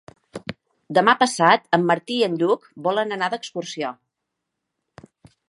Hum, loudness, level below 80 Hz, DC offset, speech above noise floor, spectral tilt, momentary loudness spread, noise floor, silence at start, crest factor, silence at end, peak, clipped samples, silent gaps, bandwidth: none; -21 LUFS; -66 dBFS; under 0.1%; 60 dB; -4.5 dB/octave; 19 LU; -81 dBFS; 0.35 s; 22 dB; 1.55 s; -2 dBFS; under 0.1%; none; 11.5 kHz